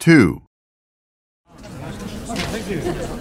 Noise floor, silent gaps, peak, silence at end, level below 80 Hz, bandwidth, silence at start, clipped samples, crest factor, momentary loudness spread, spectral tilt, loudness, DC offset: under -90 dBFS; 0.47-1.44 s; 0 dBFS; 0 s; -40 dBFS; 15.5 kHz; 0 s; under 0.1%; 20 dB; 20 LU; -6 dB/octave; -20 LUFS; under 0.1%